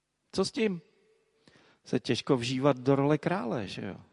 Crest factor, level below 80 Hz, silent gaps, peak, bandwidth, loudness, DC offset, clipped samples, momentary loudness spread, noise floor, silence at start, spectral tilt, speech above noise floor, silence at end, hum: 20 dB; -64 dBFS; none; -10 dBFS; 11.5 kHz; -30 LUFS; under 0.1%; under 0.1%; 11 LU; -68 dBFS; 0.35 s; -6 dB/octave; 39 dB; 0.1 s; none